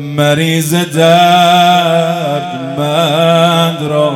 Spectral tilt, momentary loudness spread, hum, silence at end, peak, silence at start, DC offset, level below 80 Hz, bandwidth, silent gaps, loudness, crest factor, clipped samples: -5 dB/octave; 9 LU; none; 0 s; 0 dBFS; 0 s; under 0.1%; -56 dBFS; 17.5 kHz; none; -10 LUFS; 10 dB; 0.5%